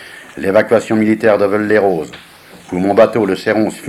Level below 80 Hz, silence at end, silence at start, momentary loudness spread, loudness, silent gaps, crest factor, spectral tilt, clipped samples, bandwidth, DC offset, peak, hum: -52 dBFS; 0 s; 0 s; 10 LU; -13 LUFS; none; 14 dB; -6.5 dB/octave; under 0.1%; 14.5 kHz; under 0.1%; 0 dBFS; none